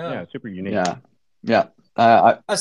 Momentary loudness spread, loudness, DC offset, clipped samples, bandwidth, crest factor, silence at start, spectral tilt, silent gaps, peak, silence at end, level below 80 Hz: 19 LU; -18 LUFS; under 0.1%; under 0.1%; 12 kHz; 18 dB; 0 s; -4.5 dB/octave; none; -2 dBFS; 0 s; -68 dBFS